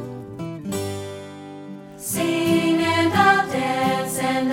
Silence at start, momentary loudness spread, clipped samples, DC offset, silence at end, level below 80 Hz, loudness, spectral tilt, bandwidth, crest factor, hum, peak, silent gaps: 0 s; 20 LU; under 0.1%; under 0.1%; 0 s; -58 dBFS; -20 LUFS; -4.5 dB/octave; 18 kHz; 18 dB; 50 Hz at -45 dBFS; -4 dBFS; none